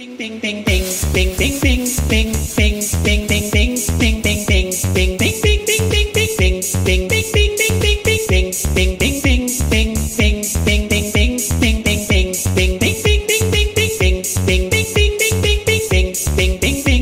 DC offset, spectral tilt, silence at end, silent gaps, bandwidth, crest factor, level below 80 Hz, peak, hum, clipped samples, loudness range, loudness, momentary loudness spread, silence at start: under 0.1%; -4 dB/octave; 0 s; none; 16.5 kHz; 14 dB; -20 dBFS; -2 dBFS; none; under 0.1%; 1 LU; -15 LUFS; 3 LU; 0 s